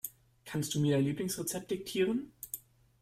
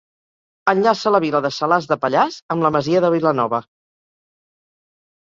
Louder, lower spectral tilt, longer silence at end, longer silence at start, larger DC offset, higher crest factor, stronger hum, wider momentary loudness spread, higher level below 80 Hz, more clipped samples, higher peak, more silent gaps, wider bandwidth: second, -34 LUFS vs -18 LUFS; about the same, -5 dB/octave vs -6 dB/octave; second, 0.45 s vs 1.7 s; second, 0.05 s vs 0.65 s; neither; about the same, 16 dB vs 18 dB; neither; first, 13 LU vs 4 LU; about the same, -66 dBFS vs -62 dBFS; neither; second, -18 dBFS vs -2 dBFS; second, none vs 2.42-2.49 s; first, 16 kHz vs 7.6 kHz